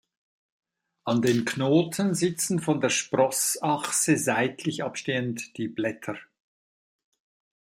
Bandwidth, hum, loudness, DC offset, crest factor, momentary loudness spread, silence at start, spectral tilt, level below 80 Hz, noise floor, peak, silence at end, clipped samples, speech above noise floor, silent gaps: 16 kHz; none; -25 LUFS; under 0.1%; 18 dB; 10 LU; 1.05 s; -4 dB/octave; -70 dBFS; under -90 dBFS; -8 dBFS; 1.4 s; under 0.1%; over 64 dB; none